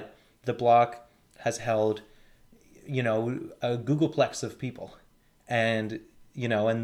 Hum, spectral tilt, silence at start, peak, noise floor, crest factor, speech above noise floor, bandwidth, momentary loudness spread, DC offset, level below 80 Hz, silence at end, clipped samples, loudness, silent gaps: none; -6 dB/octave; 0 s; -10 dBFS; -57 dBFS; 20 dB; 30 dB; 14 kHz; 17 LU; under 0.1%; -64 dBFS; 0 s; under 0.1%; -28 LUFS; none